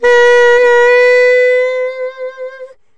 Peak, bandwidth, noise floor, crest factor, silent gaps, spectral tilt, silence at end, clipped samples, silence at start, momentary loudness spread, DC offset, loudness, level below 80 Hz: -2 dBFS; 9.2 kHz; -32 dBFS; 8 dB; none; -0.5 dB/octave; 0 s; under 0.1%; 0 s; 17 LU; under 0.1%; -8 LUFS; -52 dBFS